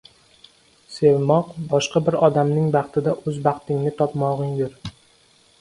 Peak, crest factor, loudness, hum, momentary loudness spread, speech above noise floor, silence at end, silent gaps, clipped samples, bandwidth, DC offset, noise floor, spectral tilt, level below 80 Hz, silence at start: -2 dBFS; 20 dB; -21 LUFS; none; 9 LU; 37 dB; 0.7 s; none; under 0.1%; 11.5 kHz; under 0.1%; -56 dBFS; -7 dB/octave; -56 dBFS; 0.9 s